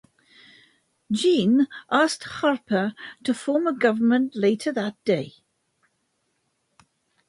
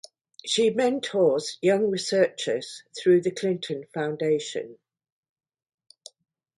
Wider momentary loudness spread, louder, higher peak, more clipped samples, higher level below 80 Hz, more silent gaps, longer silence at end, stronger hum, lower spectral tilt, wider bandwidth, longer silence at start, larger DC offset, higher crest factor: second, 8 LU vs 11 LU; about the same, -23 LUFS vs -25 LUFS; about the same, -6 dBFS vs -8 dBFS; neither; about the same, -70 dBFS vs -74 dBFS; neither; first, 2 s vs 1.85 s; neither; about the same, -5 dB/octave vs -4.5 dB/octave; about the same, 11.5 kHz vs 11.5 kHz; first, 1.1 s vs 0.45 s; neither; about the same, 18 dB vs 20 dB